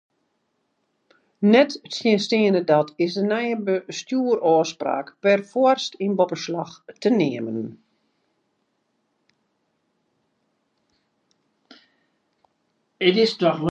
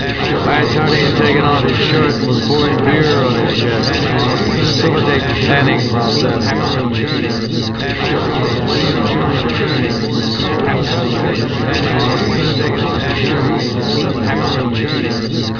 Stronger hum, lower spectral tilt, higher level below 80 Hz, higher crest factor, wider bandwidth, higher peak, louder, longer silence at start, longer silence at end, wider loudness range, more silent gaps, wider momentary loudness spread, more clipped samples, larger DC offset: neither; about the same, -5.5 dB/octave vs -6 dB/octave; second, -76 dBFS vs -34 dBFS; first, 22 dB vs 14 dB; first, 8.8 kHz vs 5.4 kHz; about the same, -2 dBFS vs 0 dBFS; second, -21 LUFS vs -14 LUFS; first, 1.4 s vs 0 s; about the same, 0 s vs 0 s; first, 8 LU vs 3 LU; neither; first, 10 LU vs 4 LU; neither; second, under 0.1% vs 0.3%